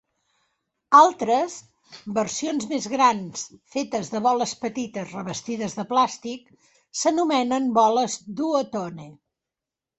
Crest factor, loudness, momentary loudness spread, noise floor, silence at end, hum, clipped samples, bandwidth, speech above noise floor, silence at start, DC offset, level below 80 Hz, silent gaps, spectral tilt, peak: 22 dB; -23 LUFS; 16 LU; -88 dBFS; 0.85 s; none; under 0.1%; 8.4 kHz; 65 dB; 0.9 s; under 0.1%; -68 dBFS; none; -4 dB/octave; -2 dBFS